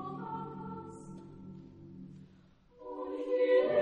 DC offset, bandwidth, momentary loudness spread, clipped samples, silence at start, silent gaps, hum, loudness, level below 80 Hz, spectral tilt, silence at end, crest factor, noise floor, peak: under 0.1%; 9.2 kHz; 24 LU; under 0.1%; 0 s; none; none; -34 LUFS; -68 dBFS; -7 dB/octave; 0 s; 18 dB; -62 dBFS; -16 dBFS